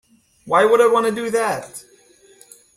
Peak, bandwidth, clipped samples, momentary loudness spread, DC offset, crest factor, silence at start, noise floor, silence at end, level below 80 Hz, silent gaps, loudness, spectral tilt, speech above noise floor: -2 dBFS; 15 kHz; under 0.1%; 19 LU; under 0.1%; 18 dB; 0.45 s; -52 dBFS; 0.95 s; -64 dBFS; none; -17 LUFS; -4 dB/octave; 35 dB